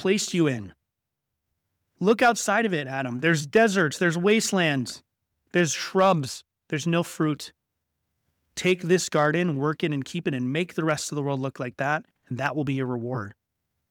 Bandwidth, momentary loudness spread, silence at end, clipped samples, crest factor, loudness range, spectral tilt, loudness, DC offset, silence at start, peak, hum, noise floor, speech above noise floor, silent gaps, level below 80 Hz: 18 kHz; 13 LU; 0.6 s; under 0.1%; 16 dB; 5 LU; -5 dB/octave; -25 LUFS; under 0.1%; 0 s; -8 dBFS; none; -84 dBFS; 59 dB; none; -68 dBFS